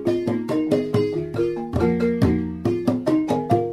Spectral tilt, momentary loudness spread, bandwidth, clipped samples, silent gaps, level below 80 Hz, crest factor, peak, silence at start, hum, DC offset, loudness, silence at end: -8 dB/octave; 4 LU; 13.5 kHz; under 0.1%; none; -42 dBFS; 16 dB; -6 dBFS; 0 s; none; under 0.1%; -22 LUFS; 0 s